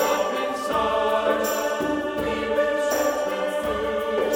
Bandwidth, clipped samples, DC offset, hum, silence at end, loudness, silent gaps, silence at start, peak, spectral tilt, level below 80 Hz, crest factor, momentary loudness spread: over 20 kHz; under 0.1%; under 0.1%; none; 0 s; -24 LUFS; none; 0 s; -10 dBFS; -3.5 dB/octave; -50 dBFS; 14 dB; 4 LU